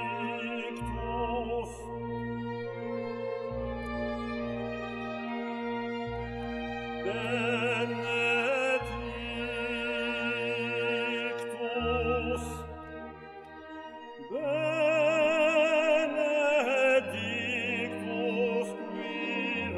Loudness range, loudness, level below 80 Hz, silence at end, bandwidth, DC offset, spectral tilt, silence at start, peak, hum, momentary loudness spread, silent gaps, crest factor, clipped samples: 9 LU; -31 LUFS; -50 dBFS; 0 s; 12.5 kHz; under 0.1%; -5 dB/octave; 0 s; -14 dBFS; none; 12 LU; none; 16 dB; under 0.1%